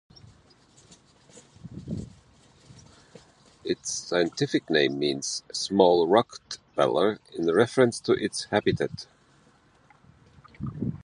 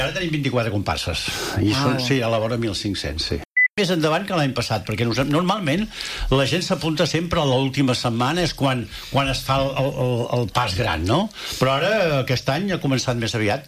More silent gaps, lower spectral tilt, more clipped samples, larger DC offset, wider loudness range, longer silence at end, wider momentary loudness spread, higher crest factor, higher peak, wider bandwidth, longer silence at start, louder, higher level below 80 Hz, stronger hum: second, none vs 3.45-3.51 s, 3.70-3.75 s; about the same, -4.5 dB/octave vs -5 dB/octave; neither; neither; first, 16 LU vs 1 LU; about the same, 0.05 s vs 0 s; first, 18 LU vs 5 LU; first, 24 dB vs 16 dB; about the same, -4 dBFS vs -4 dBFS; second, 11.5 kHz vs 15.5 kHz; first, 1.35 s vs 0 s; second, -25 LUFS vs -21 LUFS; second, -58 dBFS vs -40 dBFS; neither